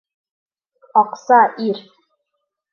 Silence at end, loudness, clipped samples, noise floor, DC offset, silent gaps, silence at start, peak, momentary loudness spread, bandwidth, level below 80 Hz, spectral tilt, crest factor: 0.95 s; -16 LUFS; under 0.1%; -76 dBFS; under 0.1%; none; 0.95 s; -2 dBFS; 10 LU; 7 kHz; -78 dBFS; -5.5 dB/octave; 18 dB